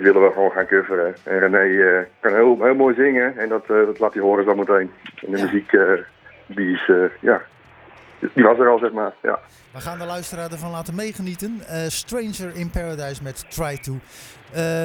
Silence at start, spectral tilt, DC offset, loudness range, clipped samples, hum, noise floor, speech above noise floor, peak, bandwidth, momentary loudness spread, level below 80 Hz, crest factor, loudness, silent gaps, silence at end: 0 s; -5.5 dB/octave; under 0.1%; 11 LU; under 0.1%; none; -46 dBFS; 27 dB; 0 dBFS; 19.5 kHz; 15 LU; -46 dBFS; 20 dB; -19 LUFS; none; 0 s